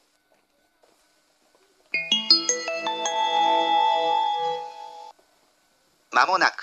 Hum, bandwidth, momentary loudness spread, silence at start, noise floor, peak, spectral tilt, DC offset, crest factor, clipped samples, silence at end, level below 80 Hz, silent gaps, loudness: none; 8.4 kHz; 16 LU; 1.95 s; -66 dBFS; -2 dBFS; 0.5 dB/octave; under 0.1%; 24 dB; under 0.1%; 0 s; -84 dBFS; none; -22 LUFS